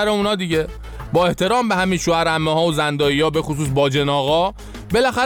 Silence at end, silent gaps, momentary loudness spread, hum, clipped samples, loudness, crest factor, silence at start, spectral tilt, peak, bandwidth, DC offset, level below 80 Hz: 0 s; none; 5 LU; none; under 0.1%; -18 LUFS; 14 dB; 0 s; -5 dB/octave; -6 dBFS; 19 kHz; under 0.1%; -38 dBFS